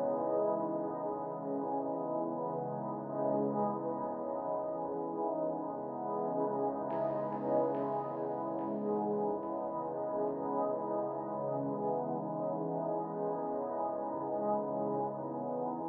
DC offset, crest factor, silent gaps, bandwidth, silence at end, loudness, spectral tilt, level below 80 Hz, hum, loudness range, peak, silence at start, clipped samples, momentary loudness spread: under 0.1%; 14 dB; none; 3.3 kHz; 0 s; -36 LUFS; -10 dB/octave; -80 dBFS; none; 1 LU; -20 dBFS; 0 s; under 0.1%; 5 LU